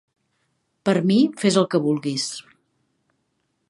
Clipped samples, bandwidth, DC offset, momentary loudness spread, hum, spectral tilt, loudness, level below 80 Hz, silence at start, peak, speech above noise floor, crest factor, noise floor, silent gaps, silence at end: under 0.1%; 11.5 kHz; under 0.1%; 10 LU; none; -5.5 dB/octave; -21 LUFS; -70 dBFS; 0.85 s; -4 dBFS; 52 dB; 20 dB; -72 dBFS; none; 1.3 s